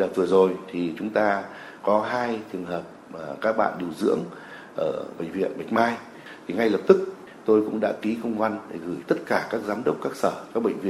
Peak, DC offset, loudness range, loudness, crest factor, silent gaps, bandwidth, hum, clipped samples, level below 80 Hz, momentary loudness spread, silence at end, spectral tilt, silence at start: -2 dBFS; under 0.1%; 4 LU; -25 LUFS; 24 dB; none; 13.5 kHz; none; under 0.1%; -68 dBFS; 14 LU; 0 s; -6.5 dB/octave; 0 s